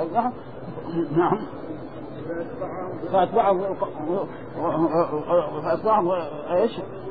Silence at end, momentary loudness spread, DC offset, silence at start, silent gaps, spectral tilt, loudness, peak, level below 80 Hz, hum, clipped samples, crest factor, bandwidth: 0 s; 14 LU; 0.7%; 0 s; none; -10.5 dB/octave; -24 LUFS; -8 dBFS; -54 dBFS; none; under 0.1%; 16 dB; 5 kHz